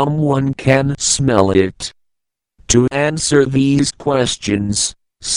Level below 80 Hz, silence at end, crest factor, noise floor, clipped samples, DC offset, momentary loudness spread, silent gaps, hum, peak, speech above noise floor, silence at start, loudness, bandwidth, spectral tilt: -40 dBFS; 0 s; 16 dB; -75 dBFS; under 0.1%; under 0.1%; 7 LU; none; none; 0 dBFS; 61 dB; 0 s; -15 LUFS; 11.5 kHz; -4.5 dB/octave